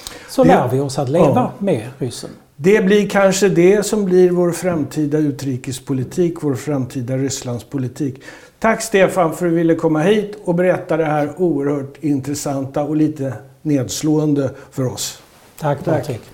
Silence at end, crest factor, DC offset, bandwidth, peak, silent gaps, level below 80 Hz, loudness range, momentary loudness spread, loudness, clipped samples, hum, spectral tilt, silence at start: 0.1 s; 14 dB; under 0.1%; 17.5 kHz; -2 dBFS; none; -50 dBFS; 6 LU; 12 LU; -17 LUFS; under 0.1%; none; -6 dB/octave; 0 s